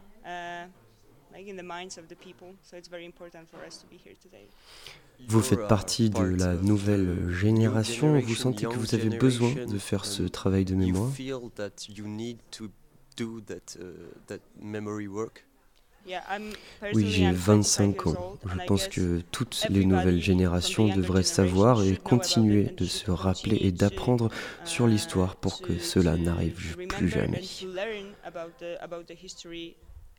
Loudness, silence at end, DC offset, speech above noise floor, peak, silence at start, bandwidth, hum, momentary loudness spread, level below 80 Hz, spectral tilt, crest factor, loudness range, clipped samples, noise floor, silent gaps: -26 LUFS; 0.1 s; under 0.1%; 34 dB; -8 dBFS; 0.25 s; 17.5 kHz; none; 20 LU; -52 dBFS; -5.5 dB/octave; 20 dB; 15 LU; under 0.1%; -61 dBFS; none